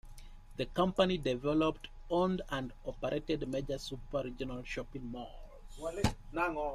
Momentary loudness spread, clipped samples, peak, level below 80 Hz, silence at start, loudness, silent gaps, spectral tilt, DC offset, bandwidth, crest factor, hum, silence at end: 14 LU; under 0.1%; -16 dBFS; -48 dBFS; 0.05 s; -36 LUFS; none; -6 dB/octave; under 0.1%; 14.5 kHz; 20 dB; none; 0 s